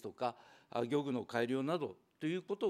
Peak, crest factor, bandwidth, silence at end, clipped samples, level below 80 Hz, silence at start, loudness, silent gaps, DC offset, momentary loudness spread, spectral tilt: -20 dBFS; 18 dB; 14.5 kHz; 0 s; under 0.1%; -88 dBFS; 0.05 s; -39 LUFS; none; under 0.1%; 7 LU; -6.5 dB/octave